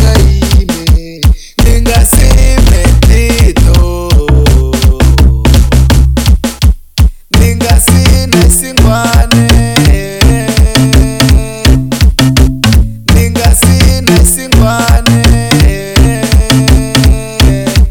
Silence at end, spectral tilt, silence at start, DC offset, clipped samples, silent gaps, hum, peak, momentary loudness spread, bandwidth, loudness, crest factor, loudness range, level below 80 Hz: 0 s; -5 dB/octave; 0 s; under 0.1%; 1%; none; none; 0 dBFS; 4 LU; 18.5 kHz; -8 LUFS; 6 dB; 1 LU; -8 dBFS